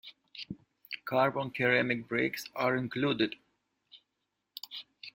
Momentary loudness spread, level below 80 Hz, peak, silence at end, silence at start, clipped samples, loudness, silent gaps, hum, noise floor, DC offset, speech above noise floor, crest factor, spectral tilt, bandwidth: 19 LU; -72 dBFS; -12 dBFS; 0.05 s; 0.05 s; under 0.1%; -31 LUFS; none; none; -84 dBFS; under 0.1%; 53 dB; 22 dB; -5.5 dB/octave; 16.5 kHz